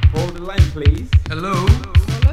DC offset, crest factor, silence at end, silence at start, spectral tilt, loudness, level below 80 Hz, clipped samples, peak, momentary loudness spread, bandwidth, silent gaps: 0.7%; 14 dB; 0 s; 0 s; -6.5 dB/octave; -17 LUFS; -18 dBFS; under 0.1%; 0 dBFS; 6 LU; 12 kHz; none